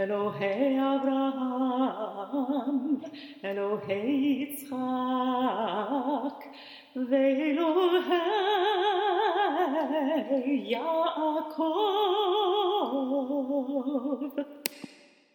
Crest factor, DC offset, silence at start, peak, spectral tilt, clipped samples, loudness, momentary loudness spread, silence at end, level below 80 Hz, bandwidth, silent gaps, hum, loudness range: 22 dB; under 0.1%; 0 s; -6 dBFS; -4.5 dB/octave; under 0.1%; -28 LUFS; 9 LU; 0.45 s; -82 dBFS; 19 kHz; none; none; 4 LU